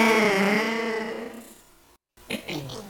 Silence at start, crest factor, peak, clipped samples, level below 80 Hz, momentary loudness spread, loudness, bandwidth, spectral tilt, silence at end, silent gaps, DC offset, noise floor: 0 s; 22 dB; -4 dBFS; under 0.1%; -62 dBFS; 17 LU; -25 LUFS; 19 kHz; -4 dB/octave; 0 s; none; under 0.1%; -58 dBFS